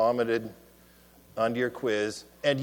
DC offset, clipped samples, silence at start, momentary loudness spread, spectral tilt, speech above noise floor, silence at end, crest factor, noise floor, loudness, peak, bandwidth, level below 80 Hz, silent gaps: under 0.1%; under 0.1%; 0 s; 9 LU; -5 dB/octave; 28 dB; 0 s; 16 dB; -57 dBFS; -29 LUFS; -12 dBFS; 19.5 kHz; -64 dBFS; none